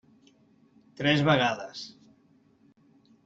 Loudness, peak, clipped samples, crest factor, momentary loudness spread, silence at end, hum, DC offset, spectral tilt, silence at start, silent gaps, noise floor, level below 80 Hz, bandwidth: -25 LUFS; -10 dBFS; under 0.1%; 22 dB; 19 LU; 1.35 s; none; under 0.1%; -3.5 dB/octave; 1 s; none; -63 dBFS; -66 dBFS; 7.8 kHz